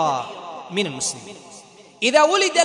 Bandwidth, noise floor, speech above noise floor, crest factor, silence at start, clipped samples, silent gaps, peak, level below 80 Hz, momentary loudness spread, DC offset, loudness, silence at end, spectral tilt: 11 kHz; -45 dBFS; 25 dB; 18 dB; 0 s; under 0.1%; none; -2 dBFS; -70 dBFS; 20 LU; under 0.1%; -20 LUFS; 0 s; -2 dB/octave